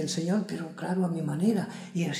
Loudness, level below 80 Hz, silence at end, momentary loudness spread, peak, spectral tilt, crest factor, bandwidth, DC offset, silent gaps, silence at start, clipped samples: -30 LUFS; -74 dBFS; 0 s; 8 LU; -14 dBFS; -6 dB/octave; 16 dB; 13.5 kHz; under 0.1%; none; 0 s; under 0.1%